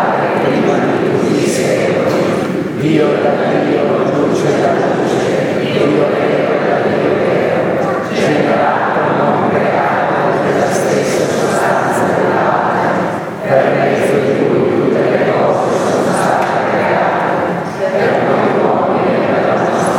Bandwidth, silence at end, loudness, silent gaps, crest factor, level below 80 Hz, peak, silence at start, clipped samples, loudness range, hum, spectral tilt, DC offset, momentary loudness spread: 17 kHz; 0 s; -13 LUFS; none; 12 dB; -54 dBFS; 0 dBFS; 0 s; under 0.1%; 1 LU; none; -6 dB/octave; under 0.1%; 2 LU